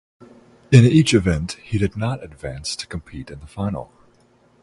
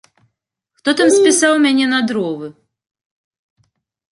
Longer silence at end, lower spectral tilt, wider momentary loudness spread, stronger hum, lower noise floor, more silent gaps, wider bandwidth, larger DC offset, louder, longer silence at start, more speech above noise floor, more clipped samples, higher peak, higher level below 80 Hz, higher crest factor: second, 0.8 s vs 1.6 s; first, -6 dB/octave vs -2.5 dB/octave; first, 19 LU vs 13 LU; neither; second, -56 dBFS vs -75 dBFS; neither; about the same, 11.5 kHz vs 11.5 kHz; neither; second, -19 LUFS vs -14 LUFS; second, 0.7 s vs 0.85 s; second, 38 dB vs 61 dB; neither; about the same, 0 dBFS vs -2 dBFS; first, -40 dBFS vs -66 dBFS; about the same, 20 dB vs 16 dB